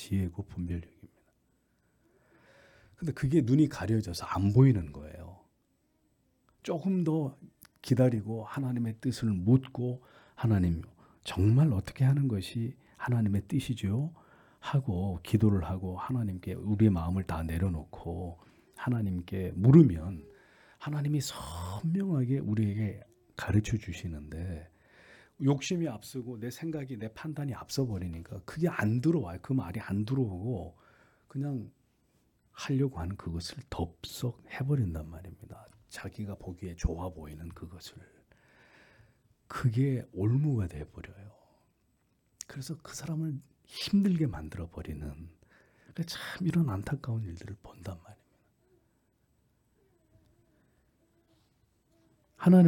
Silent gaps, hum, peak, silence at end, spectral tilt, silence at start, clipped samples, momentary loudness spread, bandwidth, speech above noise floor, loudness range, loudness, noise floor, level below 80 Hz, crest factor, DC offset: none; none; -8 dBFS; 0 s; -7.5 dB/octave; 0 s; under 0.1%; 18 LU; 18 kHz; 43 dB; 9 LU; -31 LUFS; -73 dBFS; -54 dBFS; 24 dB; under 0.1%